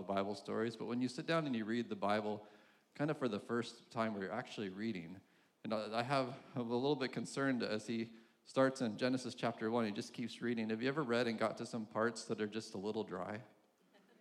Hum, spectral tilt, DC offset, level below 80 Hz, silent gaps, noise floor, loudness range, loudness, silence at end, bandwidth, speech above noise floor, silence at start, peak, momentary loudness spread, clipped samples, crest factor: none; -5.5 dB/octave; under 0.1%; -90 dBFS; none; -71 dBFS; 3 LU; -40 LUFS; 0.75 s; 12 kHz; 31 dB; 0 s; -20 dBFS; 8 LU; under 0.1%; 20 dB